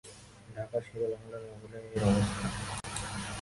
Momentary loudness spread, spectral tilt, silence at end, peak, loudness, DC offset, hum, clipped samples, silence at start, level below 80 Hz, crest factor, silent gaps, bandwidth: 18 LU; -5.5 dB/octave; 0 s; -14 dBFS; -34 LUFS; under 0.1%; none; under 0.1%; 0.05 s; -50 dBFS; 20 dB; none; 11.5 kHz